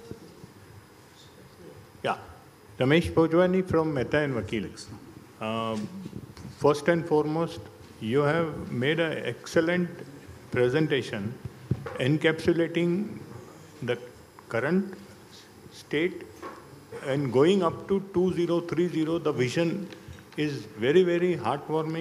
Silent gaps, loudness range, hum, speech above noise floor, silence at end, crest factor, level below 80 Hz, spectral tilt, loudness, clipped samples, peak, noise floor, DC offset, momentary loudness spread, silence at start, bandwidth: none; 5 LU; none; 26 dB; 0 s; 20 dB; -58 dBFS; -6.5 dB/octave; -27 LUFS; under 0.1%; -8 dBFS; -52 dBFS; under 0.1%; 21 LU; 0 s; 15 kHz